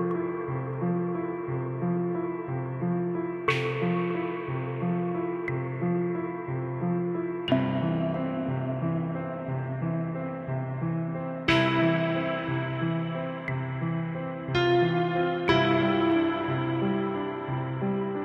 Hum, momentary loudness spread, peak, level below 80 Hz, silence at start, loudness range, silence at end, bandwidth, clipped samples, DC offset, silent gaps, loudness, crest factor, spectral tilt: none; 8 LU; -10 dBFS; -58 dBFS; 0 s; 5 LU; 0 s; 7.6 kHz; under 0.1%; under 0.1%; none; -28 LUFS; 18 dB; -8 dB/octave